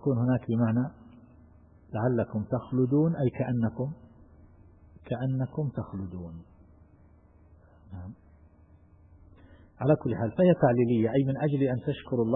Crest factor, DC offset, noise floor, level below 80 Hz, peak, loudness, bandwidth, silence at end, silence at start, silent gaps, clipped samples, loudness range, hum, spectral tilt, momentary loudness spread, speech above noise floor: 20 dB; under 0.1%; -57 dBFS; -58 dBFS; -8 dBFS; -28 LUFS; 3.9 kHz; 0 s; 0 s; none; under 0.1%; 13 LU; none; -12.5 dB/octave; 18 LU; 30 dB